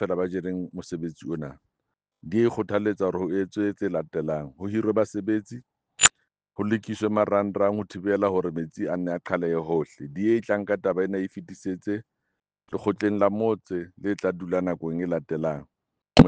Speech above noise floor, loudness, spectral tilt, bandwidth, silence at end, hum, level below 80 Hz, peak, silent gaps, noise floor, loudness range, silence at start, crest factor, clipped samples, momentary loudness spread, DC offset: 56 dB; -26 LUFS; -4.5 dB/octave; 9.8 kHz; 0 s; none; -50 dBFS; -2 dBFS; none; -82 dBFS; 4 LU; 0 s; 24 dB; under 0.1%; 11 LU; under 0.1%